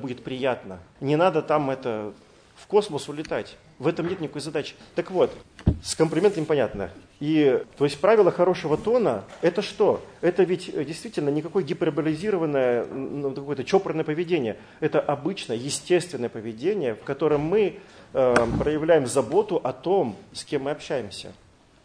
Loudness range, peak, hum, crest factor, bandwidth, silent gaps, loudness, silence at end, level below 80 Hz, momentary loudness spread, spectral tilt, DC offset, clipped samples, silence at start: 5 LU; -2 dBFS; none; 22 dB; 10.5 kHz; none; -25 LUFS; 0.5 s; -48 dBFS; 11 LU; -5.5 dB/octave; under 0.1%; under 0.1%; 0 s